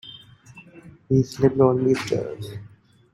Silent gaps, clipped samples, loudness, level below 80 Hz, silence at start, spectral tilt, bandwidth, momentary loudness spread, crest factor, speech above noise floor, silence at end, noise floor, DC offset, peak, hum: none; under 0.1%; -21 LUFS; -54 dBFS; 0.05 s; -7.5 dB/octave; 13 kHz; 19 LU; 20 dB; 27 dB; 0.45 s; -48 dBFS; under 0.1%; -4 dBFS; none